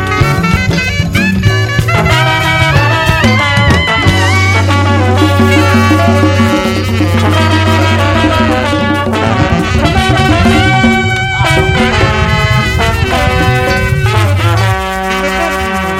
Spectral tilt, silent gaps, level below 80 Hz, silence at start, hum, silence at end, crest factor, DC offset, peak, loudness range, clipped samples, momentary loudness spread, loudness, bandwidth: -5.5 dB/octave; none; -24 dBFS; 0 s; none; 0 s; 10 dB; under 0.1%; 0 dBFS; 2 LU; 0.3%; 4 LU; -9 LUFS; 16 kHz